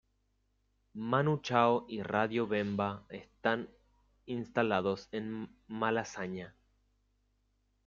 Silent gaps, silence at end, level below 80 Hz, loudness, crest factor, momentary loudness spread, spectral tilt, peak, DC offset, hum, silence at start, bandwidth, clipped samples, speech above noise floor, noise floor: none; 1.4 s; -70 dBFS; -34 LUFS; 24 dB; 15 LU; -6.5 dB/octave; -12 dBFS; under 0.1%; none; 0.95 s; 7.4 kHz; under 0.1%; 43 dB; -76 dBFS